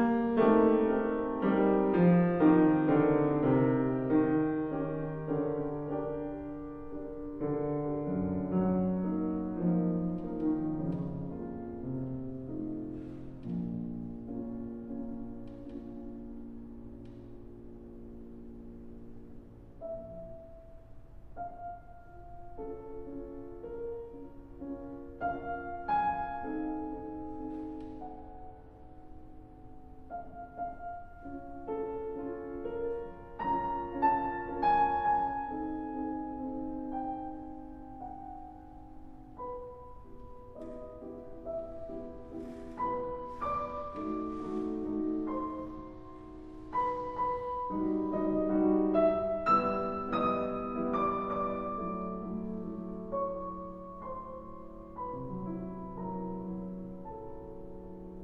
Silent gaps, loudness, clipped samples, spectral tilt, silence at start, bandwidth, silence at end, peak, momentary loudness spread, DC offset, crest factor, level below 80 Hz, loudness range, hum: none; -33 LUFS; under 0.1%; -10.5 dB/octave; 0 s; 5.4 kHz; 0 s; -12 dBFS; 22 LU; under 0.1%; 20 dB; -54 dBFS; 17 LU; none